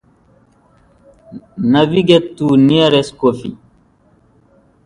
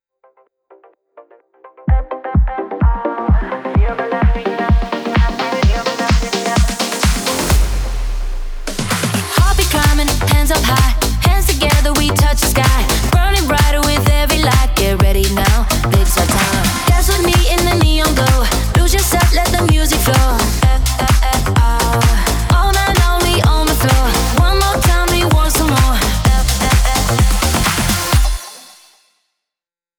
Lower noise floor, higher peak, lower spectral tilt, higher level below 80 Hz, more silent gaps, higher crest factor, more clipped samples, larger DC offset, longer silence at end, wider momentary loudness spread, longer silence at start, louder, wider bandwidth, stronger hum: second, -52 dBFS vs -88 dBFS; about the same, 0 dBFS vs 0 dBFS; first, -7 dB/octave vs -4 dB/octave; second, -50 dBFS vs -16 dBFS; neither; about the same, 16 dB vs 12 dB; neither; neither; about the same, 1.3 s vs 1.4 s; first, 15 LU vs 5 LU; about the same, 1.3 s vs 1.2 s; about the same, -13 LUFS vs -14 LUFS; second, 10.5 kHz vs over 20 kHz; neither